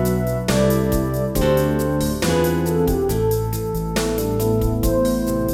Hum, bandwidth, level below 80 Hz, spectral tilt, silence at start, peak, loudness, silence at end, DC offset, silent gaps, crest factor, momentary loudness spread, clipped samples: none; 19 kHz; -30 dBFS; -6 dB/octave; 0 s; -4 dBFS; -20 LUFS; 0 s; under 0.1%; none; 14 dB; 4 LU; under 0.1%